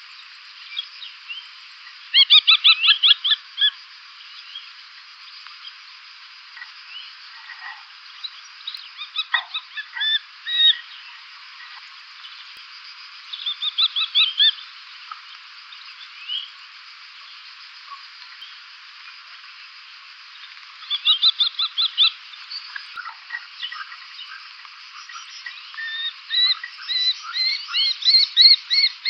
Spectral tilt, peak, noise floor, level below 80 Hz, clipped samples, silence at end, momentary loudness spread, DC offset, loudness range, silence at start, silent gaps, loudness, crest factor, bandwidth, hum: 7 dB/octave; -2 dBFS; -43 dBFS; under -90 dBFS; under 0.1%; 0 s; 26 LU; under 0.1%; 22 LU; 0 s; none; -17 LUFS; 22 dB; 8 kHz; none